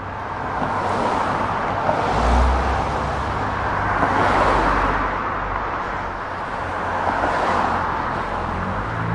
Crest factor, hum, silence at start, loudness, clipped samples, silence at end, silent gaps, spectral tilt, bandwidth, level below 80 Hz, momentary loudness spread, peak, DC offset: 18 dB; none; 0 s; -21 LUFS; under 0.1%; 0 s; none; -6 dB/octave; 11 kHz; -30 dBFS; 8 LU; -2 dBFS; under 0.1%